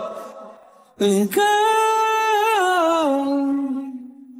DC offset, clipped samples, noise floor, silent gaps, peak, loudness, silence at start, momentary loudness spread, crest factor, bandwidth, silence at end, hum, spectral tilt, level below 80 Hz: under 0.1%; under 0.1%; -47 dBFS; none; -8 dBFS; -19 LUFS; 0 s; 16 LU; 12 dB; 16.5 kHz; 0 s; none; -4 dB/octave; -70 dBFS